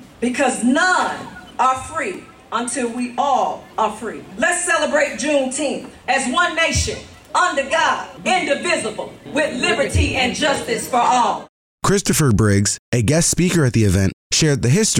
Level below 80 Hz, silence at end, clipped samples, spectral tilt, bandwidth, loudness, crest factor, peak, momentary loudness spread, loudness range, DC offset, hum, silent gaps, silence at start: -40 dBFS; 0 s; under 0.1%; -4 dB/octave; 16.5 kHz; -18 LUFS; 12 dB; -6 dBFS; 9 LU; 4 LU; under 0.1%; none; 11.49-11.78 s, 12.79-12.92 s, 14.13-14.30 s; 0 s